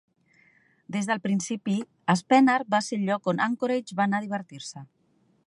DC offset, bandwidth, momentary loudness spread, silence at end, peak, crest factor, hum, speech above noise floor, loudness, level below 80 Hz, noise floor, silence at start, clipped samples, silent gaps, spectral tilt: under 0.1%; 11.5 kHz; 14 LU; 0.6 s; -6 dBFS; 20 dB; none; 41 dB; -26 LUFS; -76 dBFS; -66 dBFS; 0.9 s; under 0.1%; none; -5.5 dB/octave